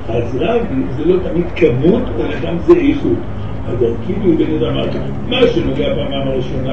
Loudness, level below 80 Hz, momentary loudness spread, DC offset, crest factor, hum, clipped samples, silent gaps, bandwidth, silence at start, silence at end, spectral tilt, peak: -16 LUFS; -30 dBFS; 8 LU; 7%; 16 dB; none; under 0.1%; none; 6.8 kHz; 0 s; 0 s; -8.5 dB/octave; 0 dBFS